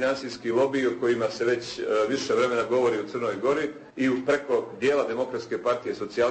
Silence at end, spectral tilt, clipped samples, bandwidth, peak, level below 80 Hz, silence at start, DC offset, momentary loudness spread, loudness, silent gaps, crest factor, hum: 0 s; -5 dB/octave; under 0.1%; 8.8 kHz; -12 dBFS; -64 dBFS; 0 s; under 0.1%; 5 LU; -26 LUFS; none; 14 dB; none